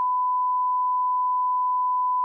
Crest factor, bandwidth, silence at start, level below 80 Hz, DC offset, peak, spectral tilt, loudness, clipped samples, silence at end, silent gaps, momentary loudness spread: 4 dB; 1.2 kHz; 0 s; under -90 dBFS; under 0.1%; -20 dBFS; 8.5 dB/octave; -23 LUFS; under 0.1%; 0 s; none; 0 LU